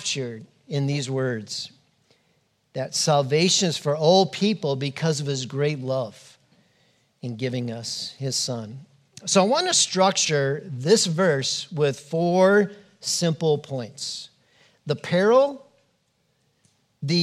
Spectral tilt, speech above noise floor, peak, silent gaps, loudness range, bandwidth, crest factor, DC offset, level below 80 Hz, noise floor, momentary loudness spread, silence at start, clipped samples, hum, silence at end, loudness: -4 dB/octave; 46 dB; -4 dBFS; none; 8 LU; 14 kHz; 20 dB; under 0.1%; -76 dBFS; -69 dBFS; 15 LU; 0 s; under 0.1%; none; 0 s; -23 LUFS